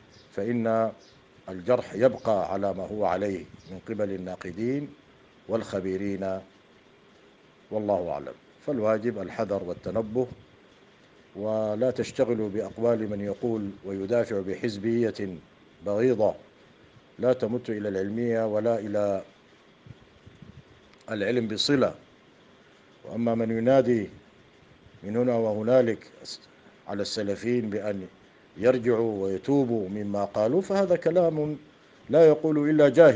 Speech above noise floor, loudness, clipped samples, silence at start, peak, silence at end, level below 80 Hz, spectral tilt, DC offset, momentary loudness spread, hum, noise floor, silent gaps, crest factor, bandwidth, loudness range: 31 dB; -27 LUFS; under 0.1%; 0.35 s; -4 dBFS; 0 s; -66 dBFS; -6.5 dB/octave; under 0.1%; 14 LU; none; -57 dBFS; none; 22 dB; 9.4 kHz; 6 LU